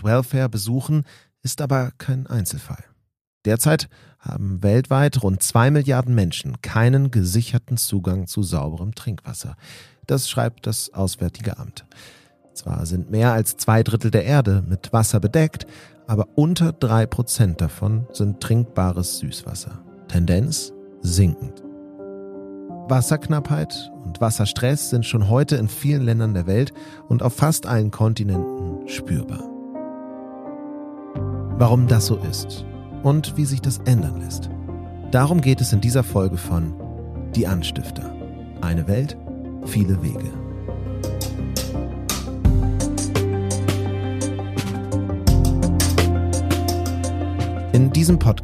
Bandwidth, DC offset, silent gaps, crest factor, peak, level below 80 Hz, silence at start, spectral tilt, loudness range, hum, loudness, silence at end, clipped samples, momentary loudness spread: 15.5 kHz; under 0.1%; 3.21-3.41 s; 18 dB; -2 dBFS; -34 dBFS; 0 s; -6 dB/octave; 6 LU; none; -21 LUFS; 0 s; under 0.1%; 15 LU